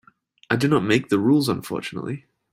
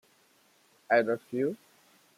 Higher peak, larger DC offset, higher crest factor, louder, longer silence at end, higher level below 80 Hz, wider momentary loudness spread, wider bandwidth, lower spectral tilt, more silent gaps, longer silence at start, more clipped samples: first, -4 dBFS vs -12 dBFS; neither; about the same, 18 dB vs 20 dB; first, -22 LUFS vs -29 LUFS; second, 0.35 s vs 0.6 s; first, -58 dBFS vs -84 dBFS; first, 13 LU vs 9 LU; about the same, 16 kHz vs 15 kHz; about the same, -6 dB/octave vs -6.5 dB/octave; neither; second, 0.5 s vs 0.9 s; neither